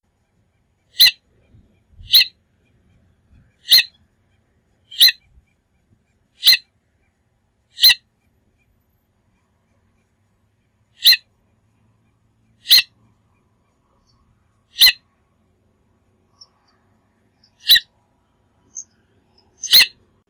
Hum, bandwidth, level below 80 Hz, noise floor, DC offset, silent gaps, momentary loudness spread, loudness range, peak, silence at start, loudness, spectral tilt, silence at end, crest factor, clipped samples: none; over 20 kHz; -58 dBFS; -65 dBFS; under 0.1%; none; 24 LU; 4 LU; -6 dBFS; 1 s; -12 LUFS; 3 dB/octave; 0.4 s; 16 dB; under 0.1%